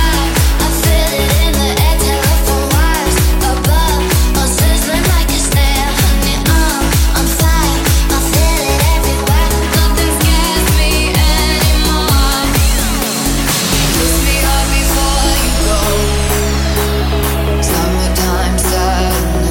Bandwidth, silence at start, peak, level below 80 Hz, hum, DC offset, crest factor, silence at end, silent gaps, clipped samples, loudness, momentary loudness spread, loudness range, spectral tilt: 17 kHz; 0 s; 0 dBFS; -14 dBFS; none; under 0.1%; 10 dB; 0 s; none; under 0.1%; -12 LUFS; 2 LU; 2 LU; -4 dB/octave